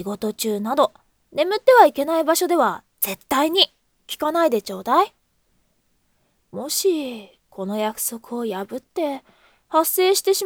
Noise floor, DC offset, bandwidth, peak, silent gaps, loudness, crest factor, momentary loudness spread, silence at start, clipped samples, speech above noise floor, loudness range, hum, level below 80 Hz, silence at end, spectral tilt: -66 dBFS; under 0.1%; over 20 kHz; 0 dBFS; none; -20 LUFS; 22 dB; 14 LU; 0 s; under 0.1%; 46 dB; 8 LU; none; -66 dBFS; 0 s; -2.5 dB/octave